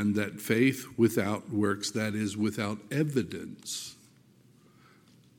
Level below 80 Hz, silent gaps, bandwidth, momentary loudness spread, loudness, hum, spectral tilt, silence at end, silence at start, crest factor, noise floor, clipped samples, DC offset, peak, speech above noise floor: -72 dBFS; none; 17.5 kHz; 11 LU; -30 LUFS; none; -5.5 dB/octave; 1.45 s; 0 s; 18 dB; -60 dBFS; under 0.1%; under 0.1%; -12 dBFS; 31 dB